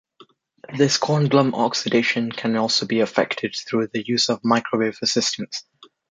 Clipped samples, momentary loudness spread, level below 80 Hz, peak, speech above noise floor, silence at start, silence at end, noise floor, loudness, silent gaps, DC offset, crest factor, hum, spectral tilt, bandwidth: under 0.1%; 6 LU; -66 dBFS; -2 dBFS; 33 dB; 0.7 s; 0.5 s; -53 dBFS; -21 LUFS; none; under 0.1%; 20 dB; none; -4 dB/octave; 9.4 kHz